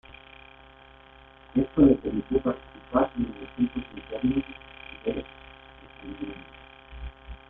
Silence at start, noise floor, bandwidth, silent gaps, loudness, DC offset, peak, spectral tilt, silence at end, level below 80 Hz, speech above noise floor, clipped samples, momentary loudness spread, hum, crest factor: 0.1 s; -52 dBFS; 3.9 kHz; none; -27 LUFS; under 0.1%; -6 dBFS; -6.5 dB/octave; 0.15 s; -46 dBFS; 26 dB; under 0.1%; 26 LU; none; 22 dB